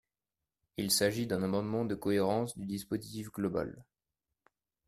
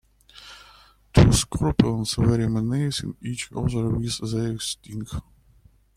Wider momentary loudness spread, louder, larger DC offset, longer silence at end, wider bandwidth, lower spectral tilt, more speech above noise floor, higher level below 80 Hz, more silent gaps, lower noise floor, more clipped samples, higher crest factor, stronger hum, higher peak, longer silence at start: second, 11 LU vs 16 LU; second, -34 LUFS vs -23 LUFS; neither; first, 1.05 s vs 0.75 s; about the same, 15.5 kHz vs 15 kHz; about the same, -4.5 dB/octave vs -5.5 dB/octave; first, over 57 dB vs 32 dB; second, -66 dBFS vs -36 dBFS; neither; first, under -90 dBFS vs -56 dBFS; neither; about the same, 20 dB vs 22 dB; neither; second, -16 dBFS vs -2 dBFS; first, 0.8 s vs 0.35 s